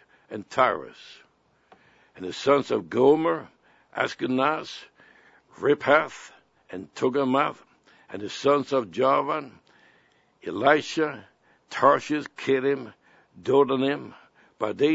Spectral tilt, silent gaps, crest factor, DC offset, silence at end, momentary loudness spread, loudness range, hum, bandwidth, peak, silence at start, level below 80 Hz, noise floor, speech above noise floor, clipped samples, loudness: -5.5 dB/octave; none; 22 dB; under 0.1%; 0 s; 19 LU; 2 LU; none; 8 kHz; -4 dBFS; 0.3 s; -72 dBFS; -63 dBFS; 39 dB; under 0.1%; -24 LUFS